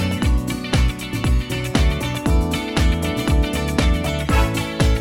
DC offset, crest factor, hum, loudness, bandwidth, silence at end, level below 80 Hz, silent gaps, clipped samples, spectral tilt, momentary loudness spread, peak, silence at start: under 0.1%; 14 dB; none; -20 LUFS; 16.5 kHz; 0 s; -22 dBFS; none; under 0.1%; -5.5 dB/octave; 3 LU; -4 dBFS; 0 s